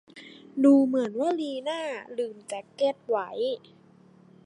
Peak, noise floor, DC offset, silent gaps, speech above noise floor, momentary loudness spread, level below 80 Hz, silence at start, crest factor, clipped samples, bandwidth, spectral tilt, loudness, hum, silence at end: -10 dBFS; -56 dBFS; under 0.1%; none; 30 dB; 18 LU; -84 dBFS; 0.15 s; 18 dB; under 0.1%; 11 kHz; -5 dB/octave; -26 LUFS; none; 0.85 s